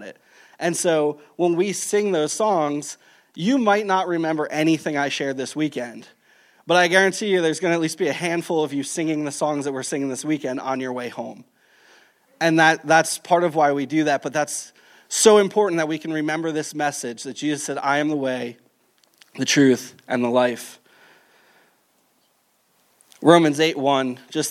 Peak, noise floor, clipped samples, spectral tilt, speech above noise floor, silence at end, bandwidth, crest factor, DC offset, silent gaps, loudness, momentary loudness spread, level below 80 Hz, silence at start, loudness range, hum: -2 dBFS; -65 dBFS; under 0.1%; -4 dB/octave; 44 dB; 0 s; 16 kHz; 20 dB; under 0.1%; none; -21 LUFS; 11 LU; -78 dBFS; 0 s; 5 LU; none